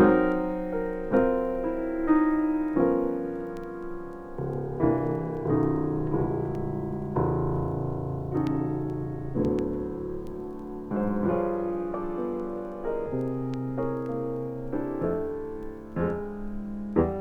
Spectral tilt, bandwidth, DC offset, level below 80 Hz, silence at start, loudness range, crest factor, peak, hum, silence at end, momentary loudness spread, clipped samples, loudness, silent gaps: -10.5 dB/octave; 5.2 kHz; under 0.1%; -44 dBFS; 0 s; 5 LU; 20 dB; -8 dBFS; none; 0 s; 11 LU; under 0.1%; -29 LUFS; none